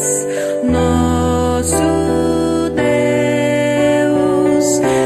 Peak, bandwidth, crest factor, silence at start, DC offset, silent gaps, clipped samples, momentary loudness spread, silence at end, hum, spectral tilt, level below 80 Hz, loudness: -2 dBFS; 14 kHz; 12 dB; 0 s; under 0.1%; none; under 0.1%; 3 LU; 0 s; none; -5 dB/octave; -30 dBFS; -14 LUFS